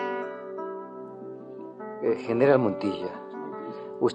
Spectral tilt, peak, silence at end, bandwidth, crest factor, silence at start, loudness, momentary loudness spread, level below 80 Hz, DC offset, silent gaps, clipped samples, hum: -7.5 dB/octave; -8 dBFS; 0 s; 8.8 kHz; 20 dB; 0 s; -28 LUFS; 19 LU; -74 dBFS; under 0.1%; none; under 0.1%; none